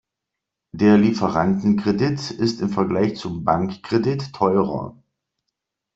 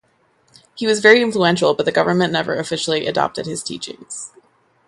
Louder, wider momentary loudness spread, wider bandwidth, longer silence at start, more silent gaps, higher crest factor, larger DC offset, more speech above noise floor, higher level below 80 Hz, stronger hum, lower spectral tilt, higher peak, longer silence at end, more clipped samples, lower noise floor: second, -20 LUFS vs -17 LUFS; second, 9 LU vs 18 LU; second, 7.8 kHz vs 11.5 kHz; about the same, 0.75 s vs 0.75 s; neither; about the same, 18 dB vs 18 dB; neither; first, 64 dB vs 42 dB; first, -54 dBFS vs -60 dBFS; neither; first, -7 dB/octave vs -4 dB/octave; second, -4 dBFS vs 0 dBFS; first, 1.05 s vs 0.6 s; neither; first, -83 dBFS vs -60 dBFS